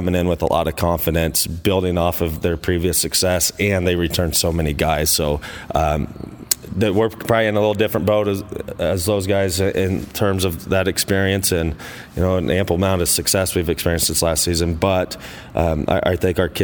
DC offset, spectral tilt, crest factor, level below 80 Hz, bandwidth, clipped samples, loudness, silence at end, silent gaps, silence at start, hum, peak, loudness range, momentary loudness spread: under 0.1%; -4 dB/octave; 18 dB; -36 dBFS; over 20 kHz; under 0.1%; -19 LUFS; 0 s; none; 0 s; none; 0 dBFS; 2 LU; 6 LU